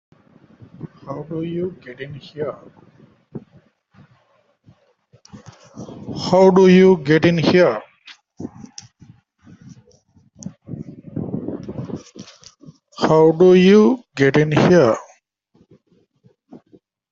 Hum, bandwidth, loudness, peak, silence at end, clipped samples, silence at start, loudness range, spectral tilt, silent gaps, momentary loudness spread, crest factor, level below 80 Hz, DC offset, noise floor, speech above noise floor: none; 7.4 kHz; -15 LUFS; 0 dBFS; 2.1 s; under 0.1%; 0.85 s; 21 LU; -7 dB/octave; none; 27 LU; 18 dB; -56 dBFS; under 0.1%; -61 dBFS; 46 dB